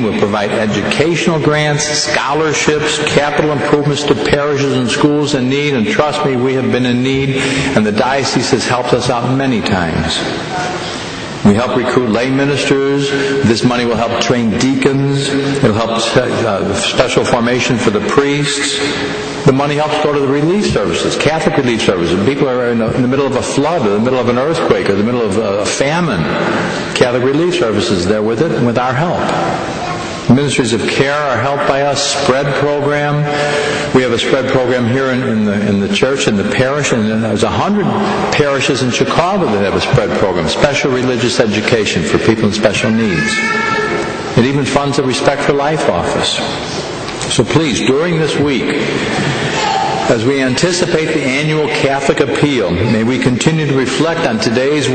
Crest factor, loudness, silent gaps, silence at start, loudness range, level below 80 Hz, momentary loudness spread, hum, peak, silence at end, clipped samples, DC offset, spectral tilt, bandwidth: 12 dB; -13 LUFS; none; 0 s; 1 LU; -40 dBFS; 3 LU; none; 0 dBFS; 0 s; under 0.1%; under 0.1%; -5 dB/octave; 9.2 kHz